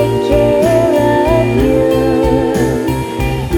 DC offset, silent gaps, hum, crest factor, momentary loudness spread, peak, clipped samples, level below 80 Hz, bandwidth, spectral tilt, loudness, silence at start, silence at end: under 0.1%; none; none; 12 dB; 6 LU; 0 dBFS; under 0.1%; -24 dBFS; 19 kHz; -7 dB/octave; -12 LUFS; 0 s; 0 s